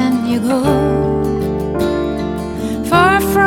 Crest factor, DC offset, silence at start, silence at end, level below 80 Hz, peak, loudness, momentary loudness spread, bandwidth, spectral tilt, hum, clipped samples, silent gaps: 14 dB; under 0.1%; 0 s; 0 s; -32 dBFS; 0 dBFS; -16 LUFS; 9 LU; 17.5 kHz; -6 dB/octave; none; under 0.1%; none